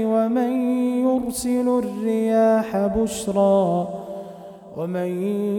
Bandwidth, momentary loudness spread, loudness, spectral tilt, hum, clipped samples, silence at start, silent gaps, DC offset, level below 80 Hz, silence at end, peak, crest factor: 18 kHz; 15 LU; -21 LUFS; -6.5 dB/octave; none; under 0.1%; 0 s; none; under 0.1%; -50 dBFS; 0 s; -8 dBFS; 12 dB